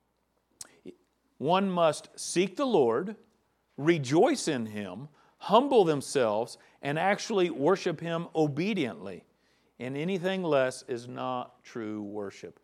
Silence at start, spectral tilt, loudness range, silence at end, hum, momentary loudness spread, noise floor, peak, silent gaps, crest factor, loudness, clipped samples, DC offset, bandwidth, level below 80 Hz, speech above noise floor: 0.6 s; -5 dB/octave; 5 LU; 0.15 s; none; 17 LU; -74 dBFS; -6 dBFS; none; 22 dB; -29 LUFS; under 0.1%; under 0.1%; 13.5 kHz; -80 dBFS; 46 dB